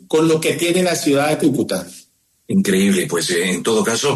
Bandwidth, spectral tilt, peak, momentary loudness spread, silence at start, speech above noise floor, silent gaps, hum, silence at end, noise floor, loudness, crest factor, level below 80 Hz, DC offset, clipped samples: 13 kHz; -4.5 dB/octave; -4 dBFS; 6 LU; 0.1 s; 37 dB; none; none; 0 s; -53 dBFS; -17 LUFS; 12 dB; -58 dBFS; under 0.1%; under 0.1%